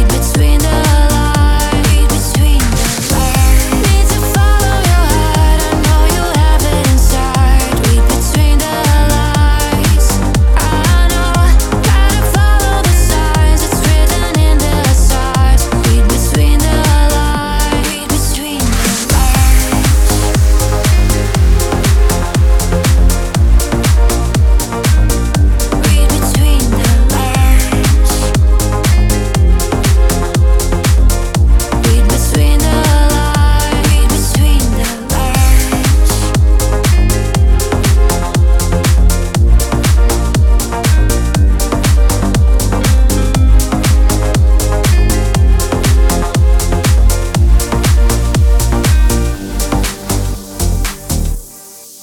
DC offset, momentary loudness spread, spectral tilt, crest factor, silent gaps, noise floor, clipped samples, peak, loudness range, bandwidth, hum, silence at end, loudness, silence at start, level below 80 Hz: under 0.1%; 2 LU; -5 dB/octave; 10 dB; none; -33 dBFS; under 0.1%; 0 dBFS; 1 LU; 18 kHz; none; 0.05 s; -12 LUFS; 0 s; -10 dBFS